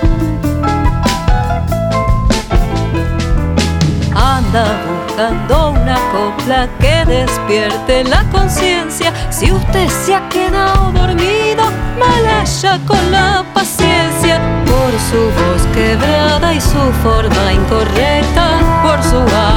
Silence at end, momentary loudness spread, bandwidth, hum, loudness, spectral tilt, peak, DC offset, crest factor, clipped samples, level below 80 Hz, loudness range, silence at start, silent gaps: 0 s; 4 LU; 18.5 kHz; none; -12 LUFS; -5 dB/octave; 0 dBFS; under 0.1%; 12 dB; under 0.1%; -18 dBFS; 2 LU; 0 s; none